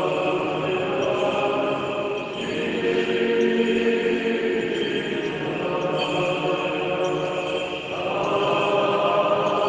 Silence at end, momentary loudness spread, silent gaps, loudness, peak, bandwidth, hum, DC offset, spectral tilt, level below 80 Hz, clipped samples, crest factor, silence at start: 0 s; 6 LU; none; -23 LUFS; -8 dBFS; 9.6 kHz; none; under 0.1%; -5.5 dB/octave; -58 dBFS; under 0.1%; 14 dB; 0 s